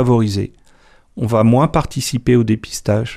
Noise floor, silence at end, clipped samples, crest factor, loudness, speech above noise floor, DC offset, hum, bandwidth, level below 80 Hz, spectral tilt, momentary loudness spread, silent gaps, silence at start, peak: -49 dBFS; 0 s; under 0.1%; 14 dB; -16 LUFS; 33 dB; under 0.1%; none; 15 kHz; -38 dBFS; -6.5 dB/octave; 10 LU; none; 0 s; -2 dBFS